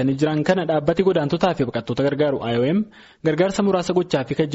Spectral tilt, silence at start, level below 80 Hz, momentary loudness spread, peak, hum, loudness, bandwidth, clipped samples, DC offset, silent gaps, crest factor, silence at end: -6 dB/octave; 0 s; -52 dBFS; 5 LU; -6 dBFS; none; -21 LUFS; 8 kHz; under 0.1%; under 0.1%; none; 14 dB; 0 s